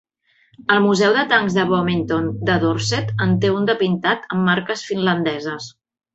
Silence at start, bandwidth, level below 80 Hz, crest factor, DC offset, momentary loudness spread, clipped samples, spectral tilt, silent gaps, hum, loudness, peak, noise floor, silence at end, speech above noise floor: 0.7 s; 8.2 kHz; -52 dBFS; 16 dB; under 0.1%; 8 LU; under 0.1%; -5.5 dB/octave; none; none; -18 LUFS; -2 dBFS; -58 dBFS; 0.45 s; 40 dB